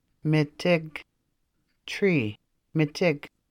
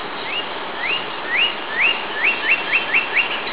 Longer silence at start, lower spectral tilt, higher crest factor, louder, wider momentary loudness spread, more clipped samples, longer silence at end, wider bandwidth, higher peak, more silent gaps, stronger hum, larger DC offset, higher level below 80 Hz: first, 0.25 s vs 0 s; first, -7 dB/octave vs 2 dB/octave; about the same, 18 dB vs 16 dB; second, -26 LUFS vs -18 LUFS; first, 14 LU vs 8 LU; neither; first, 0.25 s vs 0 s; first, 15 kHz vs 4 kHz; second, -10 dBFS vs -4 dBFS; neither; neither; second, under 0.1% vs 2%; about the same, -64 dBFS vs -62 dBFS